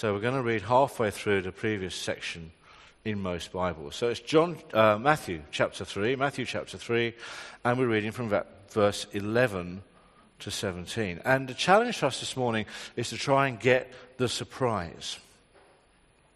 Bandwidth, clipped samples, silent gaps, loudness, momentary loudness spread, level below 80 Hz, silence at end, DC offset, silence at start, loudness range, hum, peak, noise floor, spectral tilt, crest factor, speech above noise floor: 13 kHz; under 0.1%; none; -28 LUFS; 12 LU; -62 dBFS; 1.15 s; under 0.1%; 0 s; 3 LU; none; -6 dBFS; -63 dBFS; -5 dB/octave; 24 dB; 35 dB